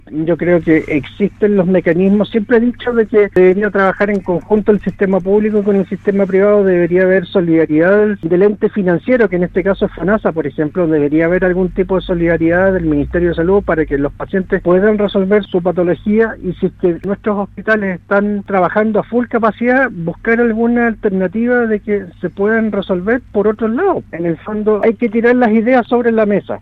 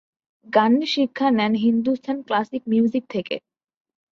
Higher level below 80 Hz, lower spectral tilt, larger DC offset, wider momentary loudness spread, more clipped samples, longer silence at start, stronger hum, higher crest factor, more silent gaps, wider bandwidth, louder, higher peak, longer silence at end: first, -36 dBFS vs -68 dBFS; first, -9.5 dB/octave vs -6 dB/octave; neither; second, 6 LU vs 9 LU; neither; second, 0.1 s vs 0.5 s; neither; second, 12 dB vs 18 dB; neither; second, 4.9 kHz vs 6.8 kHz; first, -14 LUFS vs -21 LUFS; first, 0 dBFS vs -4 dBFS; second, 0.05 s vs 0.75 s